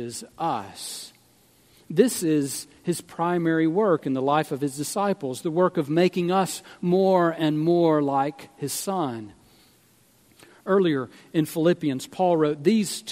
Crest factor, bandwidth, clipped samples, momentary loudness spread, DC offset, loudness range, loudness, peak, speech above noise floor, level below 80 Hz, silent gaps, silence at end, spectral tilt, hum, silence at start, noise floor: 20 dB; 16 kHz; under 0.1%; 10 LU; under 0.1%; 5 LU; -24 LUFS; -4 dBFS; 36 dB; -70 dBFS; none; 0 s; -5.5 dB/octave; none; 0 s; -59 dBFS